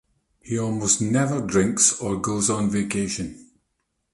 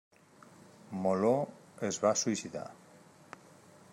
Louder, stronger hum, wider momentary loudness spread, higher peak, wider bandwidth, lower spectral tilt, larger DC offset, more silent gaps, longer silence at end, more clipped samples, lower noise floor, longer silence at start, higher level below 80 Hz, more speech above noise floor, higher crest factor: first, -22 LUFS vs -33 LUFS; neither; second, 10 LU vs 24 LU; first, -6 dBFS vs -14 dBFS; second, 11.5 kHz vs 16 kHz; about the same, -4 dB/octave vs -4.5 dB/octave; neither; neither; second, 0.7 s vs 1.2 s; neither; first, -75 dBFS vs -59 dBFS; second, 0.45 s vs 0.9 s; first, -52 dBFS vs -82 dBFS; first, 52 dB vs 27 dB; about the same, 18 dB vs 20 dB